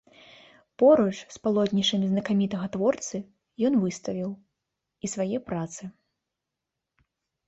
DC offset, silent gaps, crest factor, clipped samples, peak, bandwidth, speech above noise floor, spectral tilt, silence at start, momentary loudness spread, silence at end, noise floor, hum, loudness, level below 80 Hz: under 0.1%; none; 20 dB; under 0.1%; -8 dBFS; 8.2 kHz; 60 dB; -5.5 dB/octave; 0.8 s; 16 LU; 1.55 s; -86 dBFS; none; -26 LUFS; -66 dBFS